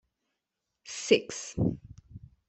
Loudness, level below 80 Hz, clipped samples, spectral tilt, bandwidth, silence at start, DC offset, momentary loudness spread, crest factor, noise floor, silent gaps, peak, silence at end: -29 LUFS; -56 dBFS; under 0.1%; -4.5 dB/octave; 8.4 kHz; 0.85 s; under 0.1%; 23 LU; 24 dB; -85 dBFS; none; -8 dBFS; 0.3 s